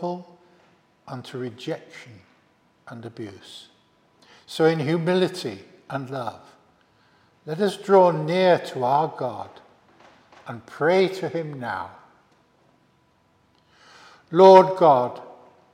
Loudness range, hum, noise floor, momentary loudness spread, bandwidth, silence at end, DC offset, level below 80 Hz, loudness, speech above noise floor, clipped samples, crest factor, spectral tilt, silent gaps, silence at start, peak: 18 LU; none; -63 dBFS; 25 LU; 14 kHz; 0.4 s; under 0.1%; -76 dBFS; -20 LUFS; 41 dB; under 0.1%; 24 dB; -6.5 dB/octave; none; 0 s; 0 dBFS